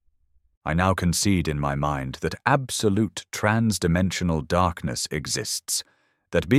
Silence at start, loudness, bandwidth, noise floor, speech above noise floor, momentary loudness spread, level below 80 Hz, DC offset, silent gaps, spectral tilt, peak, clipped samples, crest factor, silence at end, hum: 0.65 s; -24 LUFS; 16 kHz; -63 dBFS; 40 dB; 6 LU; -42 dBFS; under 0.1%; none; -4.5 dB/octave; -4 dBFS; under 0.1%; 20 dB; 0 s; none